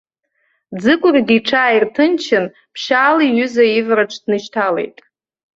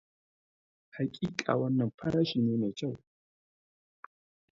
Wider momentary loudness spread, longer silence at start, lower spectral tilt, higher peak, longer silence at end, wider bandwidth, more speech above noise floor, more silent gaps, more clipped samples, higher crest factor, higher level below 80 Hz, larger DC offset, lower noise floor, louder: about the same, 9 LU vs 10 LU; second, 0.7 s vs 0.95 s; second, -5 dB/octave vs -7 dB/octave; first, -2 dBFS vs -10 dBFS; second, 0.7 s vs 1.55 s; about the same, 7.8 kHz vs 7.6 kHz; second, 51 dB vs over 59 dB; second, none vs 1.94-1.98 s; neither; second, 14 dB vs 24 dB; first, -60 dBFS vs -66 dBFS; neither; second, -65 dBFS vs under -90 dBFS; first, -14 LUFS vs -32 LUFS